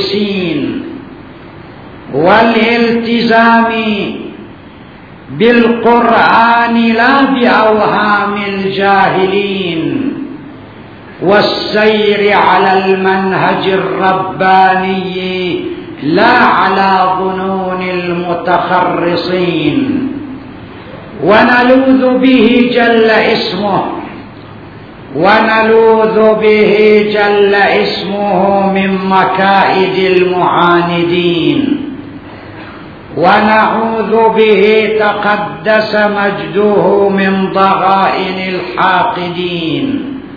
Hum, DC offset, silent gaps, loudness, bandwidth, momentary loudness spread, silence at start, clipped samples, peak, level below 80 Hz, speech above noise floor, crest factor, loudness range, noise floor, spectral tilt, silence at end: none; 0.2%; none; -10 LUFS; 5.4 kHz; 13 LU; 0 s; 0.6%; 0 dBFS; -44 dBFS; 23 dB; 10 dB; 4 LU; -33 dBFS; -7.5 dB/octave; 0 s